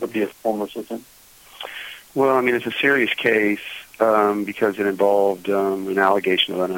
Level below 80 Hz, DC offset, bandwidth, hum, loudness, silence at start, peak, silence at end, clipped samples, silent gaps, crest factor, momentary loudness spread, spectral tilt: -64 dBFS; under 0.1%; 17 kHz; none; -20 LUFS; 0 s; -2 dBFS; 0 s; under 0.1%; none; 18 dB; 15 LU; -4.5 dB/octave